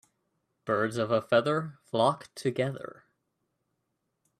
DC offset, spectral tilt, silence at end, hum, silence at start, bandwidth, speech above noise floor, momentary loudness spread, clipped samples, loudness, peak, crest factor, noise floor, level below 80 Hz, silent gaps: under 0.1%; -6 dB/octave; 1.5 s; none; 0.65 s; 13.5 kHz; 52 dB; 13 LU; under 0.1%; -29 LUFS; -10 dBFS; 22 dB; -80 dBFS; -72 dBFS; none